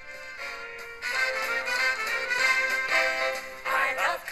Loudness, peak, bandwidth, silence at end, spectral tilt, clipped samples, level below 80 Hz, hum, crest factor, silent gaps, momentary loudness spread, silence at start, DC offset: -26 LUFS; -12 dBFS; 13 kHz; 0 s; 0 dB/octave; under 0.1%; -60 dBFS; none; 16 dB; none; 13 LU; 0 s; under 0.1%